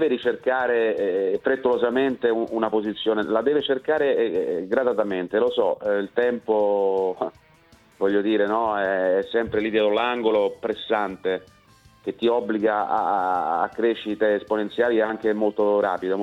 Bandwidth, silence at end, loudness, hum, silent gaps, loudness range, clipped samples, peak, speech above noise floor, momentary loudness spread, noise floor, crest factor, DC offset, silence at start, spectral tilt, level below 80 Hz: 6.2 kHz; 0 s; -23 LUFS; none; none; 2 LU; under 0.1%; -6 dBFS; 32 dB; 4 LU; -55 dBFS; 16 dB; under 0.1%; 0 s; -6.5 dB/octave; -62 dBFS